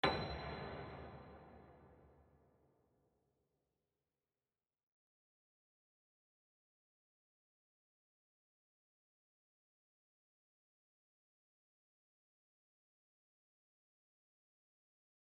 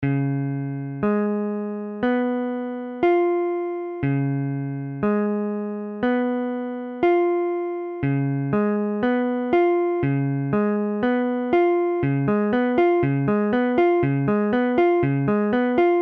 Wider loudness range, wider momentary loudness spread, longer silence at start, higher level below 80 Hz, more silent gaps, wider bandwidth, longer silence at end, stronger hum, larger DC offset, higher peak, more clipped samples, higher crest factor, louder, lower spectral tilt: first, 18 LU vs 4 LU; first, 22 LU vs 8 LU; about the same, 0.05 s vs 0 s; second, -68 dBFS vs -54 dBFS; neither; first, 6 kHz vs 4.5 kHz; first, 13.05 s vs 0 s; neither; neither; second, -22 dBFS vs -8 dBFS; neither; first, 32 dB vs 14 dB; second, -46 LUFS vs -22 LUFS; second, -3 dB/octave vs -10.5 dB/octave